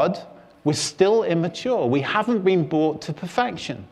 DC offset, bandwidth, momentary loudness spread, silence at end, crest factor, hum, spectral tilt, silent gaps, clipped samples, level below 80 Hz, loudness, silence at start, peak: under 0.1%; 12.5 kHz; 9 LU; 0.05 s; 18 dB; none; -5.5 dB/octave; none; under 0.1%; -60 dBFS; -22 LUFS; 0 s; -4 dBFS